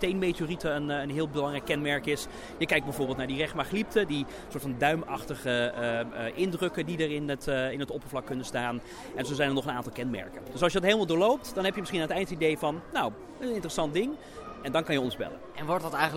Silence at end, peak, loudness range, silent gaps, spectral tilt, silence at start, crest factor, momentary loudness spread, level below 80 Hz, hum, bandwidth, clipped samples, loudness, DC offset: 0 s; -8 dBFS; 4 LU; none; -5 dB/octave; 0 s; 22 dB; 9 LU; -52 dBFS; none; 16.5 kHz; under 0.1%; -30 LUFS; under 0.1%